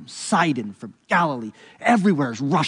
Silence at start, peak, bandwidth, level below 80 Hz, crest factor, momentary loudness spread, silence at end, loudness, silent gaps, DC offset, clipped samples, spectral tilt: 0 s; -6 dBFS; 11 kHz; -72 dBFS; 16 dB; 16 LU; 0 s; -21 LUFS; none; under 0.1%; under 0.1%; -5.5 dB/octave